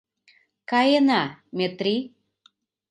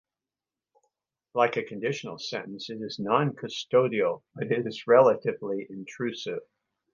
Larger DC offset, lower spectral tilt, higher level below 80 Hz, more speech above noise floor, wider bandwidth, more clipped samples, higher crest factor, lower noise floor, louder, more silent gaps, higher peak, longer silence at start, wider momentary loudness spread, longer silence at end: neither; about the same, -5.5 dB/octave vs -5.5 dB/octave; about the same, -76 dBFS vs -76 dBFS; second, 41 dB vs over 63 dB; first, 9.2 kHz vs 7.4 kHz; neither; about the same, 18 dB vs 22 dB; second, -63 dBFS vs under -90 dBFS; first, -22 LUFS vs -27 LUFS; neither; about the same, -8 dBFS vs -6 dBFS; second, 0.7 s vs 1.35 s; about the same, 15 LU vs 14 LU; first, 0.85 s vs 0.5 s